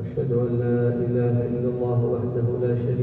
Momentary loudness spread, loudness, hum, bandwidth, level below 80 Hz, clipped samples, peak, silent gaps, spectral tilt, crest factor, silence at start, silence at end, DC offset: 2 LU; -24 LUFS; none; 3.7 kHz; -50 dBFS; under 0.1%; -12 dBFS; none; -12.5 dB/octave; 10 dB; 0 s; 0 s; under 0.1%